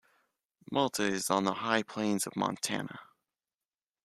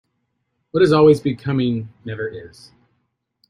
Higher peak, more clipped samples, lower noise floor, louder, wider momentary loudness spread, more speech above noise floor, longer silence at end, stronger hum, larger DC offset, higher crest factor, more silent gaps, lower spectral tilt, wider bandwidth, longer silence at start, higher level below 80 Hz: second, -12 dBFS vs -2 dBFS; neither; first, under -90 dBFS vs -72 dBFS; second, -32 LUFS vs -18 LUFS; second, 7 LU vs 17 LU; first, over 58 dB vs 54 dB; about the same, 1 s vs 1.05 s; neither; neither; about the same, 22 dB vs 18 dB; neither; second, -3.5 dB/octave vs -7.5 dB/octave; first, 14.5 kHz vs 11 kHz; about the same, 0.7 s vs 0.75 s; second, -74 dBFS vs -54 dBFS